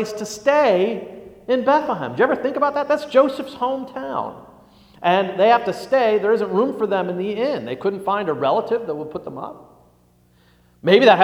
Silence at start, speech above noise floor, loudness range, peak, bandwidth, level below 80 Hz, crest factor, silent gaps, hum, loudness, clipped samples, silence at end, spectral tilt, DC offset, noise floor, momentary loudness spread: 0 s; 37 dB; 5 LU; 0 dBFS; 15.5 kHz; -62 dBFS; 20 dB; none; 60 Hz at -55 dBFS; -19 LUFS; under 0.1%; 0 s; -5.5 dB/octave; under 0.1%; -56 dBFS; 12 LU